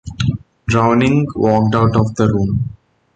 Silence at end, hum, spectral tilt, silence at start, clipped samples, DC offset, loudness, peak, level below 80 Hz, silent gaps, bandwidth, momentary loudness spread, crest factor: 0.45 s; none; -7.5 dB/octave; 0.05 s; under 0.1%; under 0.1%; -15 LUFS; 0 dBFS; -36 dBFS; none; 8.8 kHz; 8 LU; 14 dB